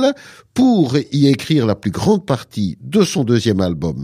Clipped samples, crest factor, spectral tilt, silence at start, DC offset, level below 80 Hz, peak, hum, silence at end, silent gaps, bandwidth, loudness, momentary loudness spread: under 0.1%; 14 dB; -6.5 dB/octave; 0 s; under 0.1%; -46 dBFS; -2 dBFS; none; 0 s; none; 15 kHz; -16 LUFS; 8 LU